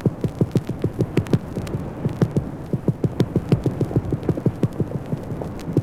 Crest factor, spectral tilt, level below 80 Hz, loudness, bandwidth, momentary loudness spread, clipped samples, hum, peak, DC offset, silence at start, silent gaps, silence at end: 20 dB; -8.5 dB/octave; -40 dBFS; -24 LUFS; 14.5 kHz; 7 LU; under 0.1%; none; -4 dBFS; under 0.1%; 0 s; none; 0 s